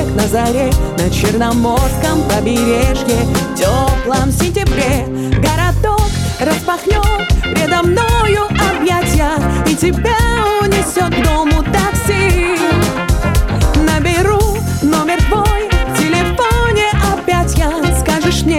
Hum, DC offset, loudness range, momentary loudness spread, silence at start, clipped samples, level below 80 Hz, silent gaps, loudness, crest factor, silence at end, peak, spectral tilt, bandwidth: none; under 0.1%; 1 LU; 3 LU; 0 s; under 0.1%; -18 dBFS; none; -13 LUFS; 10 dB; 0 s; -2 dBFS; -5 dB/octave; 17.5 kHz